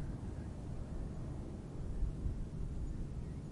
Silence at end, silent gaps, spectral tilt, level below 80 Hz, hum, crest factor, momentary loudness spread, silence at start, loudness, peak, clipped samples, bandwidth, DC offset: 0 s; none; -8 dB/octave; -44 dBFS; none; 14 dB; 4 LU; 0 s; -45 LUFS; -26 dBFS; under 0.1%; 11.5 kHz; under 0.1%